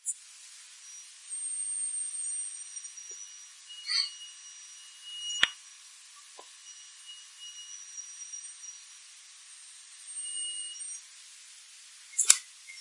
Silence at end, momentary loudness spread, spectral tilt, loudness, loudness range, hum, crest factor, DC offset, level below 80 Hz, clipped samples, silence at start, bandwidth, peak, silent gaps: 0 s; 20 LU; 4 dB/octave; -32 LUFS; 11 LU; none; 38 dB; under 0.1%; -82 dBFS; under 0.1%; 0.05 s; 11.5 kHz; 0 dBFS; none